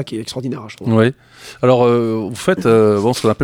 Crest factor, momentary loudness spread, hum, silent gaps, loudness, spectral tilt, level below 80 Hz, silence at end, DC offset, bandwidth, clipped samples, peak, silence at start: 14 dB; 13 LU; none; none; -15 LUFS; -6.5 dB/octave; -54 dBFS; 0 s; under 0.1%; 16 kHz; under 0.1%; 0 dBFS; 0 s